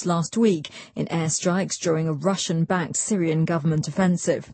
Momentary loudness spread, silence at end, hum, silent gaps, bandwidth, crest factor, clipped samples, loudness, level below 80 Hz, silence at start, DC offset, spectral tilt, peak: 4 LU; 0 s; none; none; 8.8 kHz; 14 dB; under 0.1%; -23 LUFS; -60 dBFS; 0 s; under 0.1%; -5 dB/octave; -8 dBFS